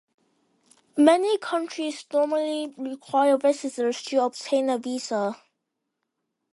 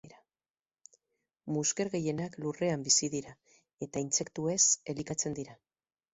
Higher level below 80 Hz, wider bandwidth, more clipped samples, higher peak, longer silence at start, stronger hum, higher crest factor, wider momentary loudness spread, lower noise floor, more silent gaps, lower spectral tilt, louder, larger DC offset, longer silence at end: second, -80 dBFS vs -70 dBFS; first, 11.5 kHz vs 8.2 kHz; neither; first, -4 dBFS vs -12 dBFS; first, 0.95 s vs 0.05 s; neither; about the same, 22 dB vs 24 dB; about the same, 12 LU vs 14 LU; second, -81 dBFS vs under -90 dBFS; neither; about the same, -3.5 dB/octave vs -3 dB/octave; first, -24 LUFS vs -31 LUFS; neither; first, 1.2 s vs 0.6 s